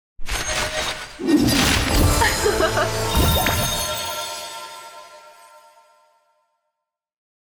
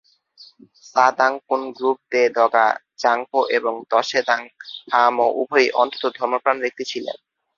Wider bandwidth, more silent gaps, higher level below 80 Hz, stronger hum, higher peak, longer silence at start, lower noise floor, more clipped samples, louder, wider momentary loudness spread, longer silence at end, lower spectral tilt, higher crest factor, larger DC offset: first, over 20 kHz vs 7.4 kHz; neither; first, -30 dBFS vs -72 dBFS; neither; second, -6 dBFS vs -2 dBFS; second, 0.2 s vs 0.4 s; first, -82 dBFS vs -50 dBFS; neither; about the same, -20 LUFS vs -20 LUFS; first, 16 LU vs 10 LU; first, 2.15 s vs 0.45 s; about the same, -3.5 dB/octave vs -2.5 dB/octave; about the same, 16 dB vs 18 dB; neither